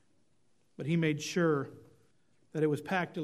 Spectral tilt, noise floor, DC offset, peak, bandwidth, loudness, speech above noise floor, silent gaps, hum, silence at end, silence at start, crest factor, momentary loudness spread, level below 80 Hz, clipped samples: -6 dB/octave; -75 dBFS; under 0.1%; -16 dBFS; 13 kHz; -32 LUFS; 43 dB; none; none; 0 s; 0.8 s; 18 dB; 12 LU; -76 dBFS; under 0.1%